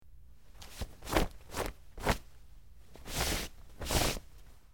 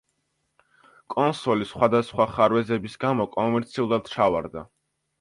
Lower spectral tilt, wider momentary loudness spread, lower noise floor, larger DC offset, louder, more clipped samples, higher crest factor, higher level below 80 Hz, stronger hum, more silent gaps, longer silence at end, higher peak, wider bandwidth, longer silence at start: second, -3.5 dB/octave vs -7 dB/octave; first, 14 LU vs 8 LU; second, -57 dBFS vs -74 dBFS; first, 0.2% vs under 0.1%; second, -36 LUFS vs -24 LUFS; neither; about the same, 24 dB vs 20 dB; first, -44 dBFS vs -56 dBFS; neither; neither; second, 0 s vs 0.55 s; second, -12 dBFS vs -4 dBFS; first, 17.5 kHz vs 11.5 kHz; second, 0 s vs 1.1 s